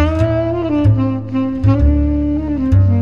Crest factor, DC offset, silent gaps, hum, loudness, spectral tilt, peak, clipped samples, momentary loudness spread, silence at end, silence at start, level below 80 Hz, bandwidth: 12 dB; 1%; none; none; -15 LUFS; -10 dB/octave; -2 dBFS; under 0.1%; 5 LU; 0 s; 0 s; -22 dBFS; 5.4 kHz